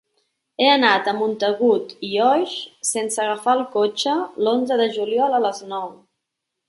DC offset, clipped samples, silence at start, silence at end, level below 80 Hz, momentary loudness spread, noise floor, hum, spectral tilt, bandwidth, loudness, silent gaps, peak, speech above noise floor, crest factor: under 0.1%; under 0.1%; 0.6 s; 0.75 s; -72 dBFS; 10 LU; -80 dBFS; none; -2.5 dB/octave; 11.5 kHz; -20 LUFS; none; -2 dBFS; 60 dB; 18 dB